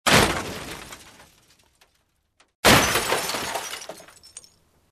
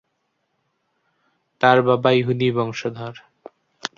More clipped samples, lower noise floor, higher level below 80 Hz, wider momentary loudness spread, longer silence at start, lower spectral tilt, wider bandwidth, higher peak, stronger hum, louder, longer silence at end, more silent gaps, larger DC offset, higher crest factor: neither; about the same, -69 dBFS vs -72 dBFS; first, -44 dBFS vs -62 dBFS; first, 27 LU vs 17 LU; second, 0.05 s vs 1.6 s; second, -2.5 dB/octave vs -6.5 dB/octave; first, 14 kHz vs 7.4 kHz; about the same, 0 dBFS vs -2 dBFS; neither; about the same, -21 LUFS vs -19 LUFS; first, 0.5 s vs 0.1 s; first, 2.55-2.63 s vs none; neither; about the same, 24 dB vs 20 dB